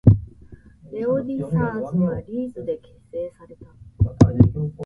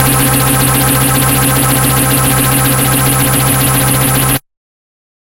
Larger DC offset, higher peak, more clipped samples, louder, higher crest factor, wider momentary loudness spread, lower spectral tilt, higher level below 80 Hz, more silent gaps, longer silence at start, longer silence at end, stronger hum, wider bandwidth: neither; about the same, 0 dBFS vs 0 dBFS; neither; second, -22 LUFS vs -9 LUFS; first, 22 dB vs 10 dB; first, 16 LU vs 1 LU; first, -10 dB/octave vs -3.5 dB/octave; second, -36 dBFS vs -28 dBFS; neither; about the same, 0.05 s vs 0 s; second, 0 s vs 1 s; neither; second, 7.2 kHz vs 17 kHz